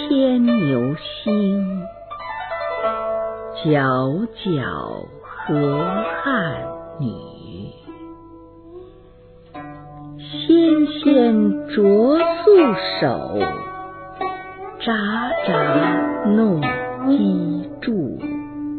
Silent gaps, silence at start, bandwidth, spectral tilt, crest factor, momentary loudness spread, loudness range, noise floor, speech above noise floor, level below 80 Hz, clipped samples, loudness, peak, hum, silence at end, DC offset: none; 0 s; 4.5 kHz; -10.5 dB/octave; 16 dB; 21 LU; 11 LU; -45 dBFS; 27 dB; -52 dBFS; under 0.1%; -19 LUFS; -2 dBFS; none; 0 s; under 0.1%